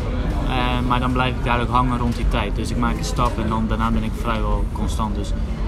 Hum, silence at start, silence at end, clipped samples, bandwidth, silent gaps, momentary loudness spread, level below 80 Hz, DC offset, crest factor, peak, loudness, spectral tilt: none; 0 s; 0 s; under 0.1%; 13 kHz; none; 5 LU; -24 dBFS; under 0.1%; 16 dB; -4 dBFS; -22 LUFS; -6 dB/octave